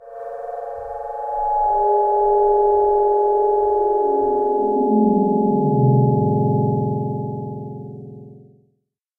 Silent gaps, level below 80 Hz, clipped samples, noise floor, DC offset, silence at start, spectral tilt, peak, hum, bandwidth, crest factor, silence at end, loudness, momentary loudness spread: none; -46 dBFS; under 0.1%; -70 dBFS; under 0.1%; 0 s; -13 dB/octave; -6 dBFS; none; 1.9 kHz; 14 dB; 0.8 s; -18 LUFS; 14 LU